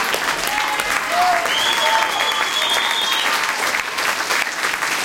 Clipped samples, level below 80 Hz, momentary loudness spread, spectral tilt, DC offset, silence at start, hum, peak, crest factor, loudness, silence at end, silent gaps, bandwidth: under 0.1%; -54 dBFS; 3 LU; 0.5 dB/octave; under 0.1%; 0 s; none; -2 dBFS; 18 dB; -17 LUFS; 0 s; none; 17 kHz